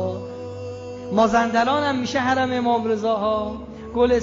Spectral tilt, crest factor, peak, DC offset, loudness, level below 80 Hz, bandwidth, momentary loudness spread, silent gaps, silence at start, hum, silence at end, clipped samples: -5.5 dB/octave; 16 dB; -6 dBFS; under 0.1%; -21 LUFS; -46 dBFS; 7.6 kHz; 15 LU; none; 0 s; none; 0 s; under 0.1%